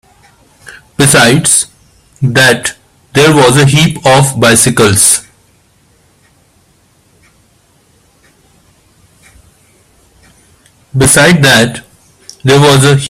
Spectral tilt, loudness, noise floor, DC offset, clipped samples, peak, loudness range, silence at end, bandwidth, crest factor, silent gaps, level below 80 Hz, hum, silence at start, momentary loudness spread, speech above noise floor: -3.5 dB/octave; -7 LUFS; -49 dBFS; under 0.1%; 0.4%; 0 dBFS; 6 LU; 0 s; over 20 kHz; 10 dB; none; -40 dBFS; none; 0.7 s; 12 LU; 43 dB